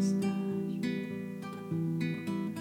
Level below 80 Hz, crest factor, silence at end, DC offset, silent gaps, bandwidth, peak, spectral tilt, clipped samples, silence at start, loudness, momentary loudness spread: -76 dBFS; 12 dB; 0 s; under 0.1%; none; 16 kHz; -20 dBFS; -7 dB/octave; under 0.1%; 0 s; -35 LUFS; 8 LU